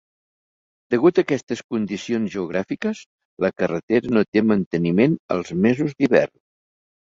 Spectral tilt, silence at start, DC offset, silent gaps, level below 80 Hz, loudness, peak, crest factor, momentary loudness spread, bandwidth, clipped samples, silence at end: -7 dB/octave; 0.9 s; under 0.1%; 1.43-1.47 s, 1.64-1.69 s, 3.06-3.18 s, 3.25-3.37 s, 3.83-3.88 s, 4.28-4.32 s, 4.66-4.71 s, 5.19-5.29 s; -58 dBFS; -21 LUFS; -2 dBFS; 20 dB; 8 LU; 7.6 kHz; under 0.1%; 0.85 s